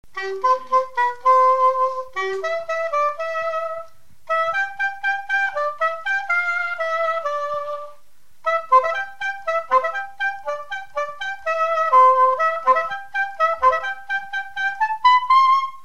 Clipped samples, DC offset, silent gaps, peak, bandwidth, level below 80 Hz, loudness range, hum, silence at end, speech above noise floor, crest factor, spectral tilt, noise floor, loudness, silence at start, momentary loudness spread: under 0.1%; 1%; none; -4 dBFS; 9.6 kHz; -62 dBFS; 5 LU; none; 0.05 s; 39 dB; 16 dB; -2 dB/octave; -59 dBFS; -20 LUFS; 0.15 s; 12 LU